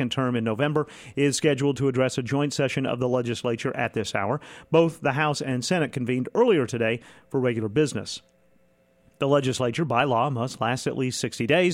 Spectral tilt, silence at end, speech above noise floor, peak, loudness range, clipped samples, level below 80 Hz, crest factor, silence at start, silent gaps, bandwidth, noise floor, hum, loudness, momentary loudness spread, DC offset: -5.5 dB/octave; 0 s; 38 dB; -6 dBFS; 2 LU; under 0.1%; -62 dBFS; 18 dB; 0 s; none; 15.5 kHz; -62 dBFS; none; -25 LUFS; 6 LU; under 0.1%